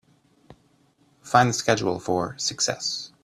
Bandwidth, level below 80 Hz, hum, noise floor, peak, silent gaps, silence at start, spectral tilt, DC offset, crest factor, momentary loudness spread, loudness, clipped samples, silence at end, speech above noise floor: 14 kHz; -60 dBFS; none; -62 dBFS; -2 dBFS; none; 0.5 s; -3.5 dB/octave; under 0.1%; 24 dB; 7 LU; -23 LUFS; under 0.1%; 0.15 s; 39 dB